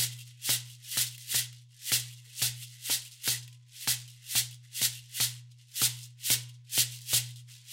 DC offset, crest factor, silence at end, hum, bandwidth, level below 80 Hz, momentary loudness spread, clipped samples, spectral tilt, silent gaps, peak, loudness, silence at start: under 0.1%; 22 dB; 0 s; none; 16.5 kHz; -70 dBFS; 12 LU; under 0.1%; 0 dB/octave; none; -10 dBFS; -30 LUFS; 0 s